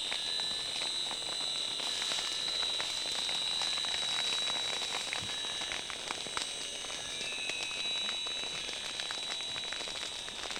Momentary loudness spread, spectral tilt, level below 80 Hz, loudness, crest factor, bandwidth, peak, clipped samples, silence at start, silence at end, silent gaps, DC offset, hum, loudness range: 6 LU; 0.5 dB/octave; -66 dBFS; -33 LUFS; 18 dB; 18 kHz; -18 dBFS; under 0.1%; 0 s; 0 s; none; under 0.1%; none; 4 LU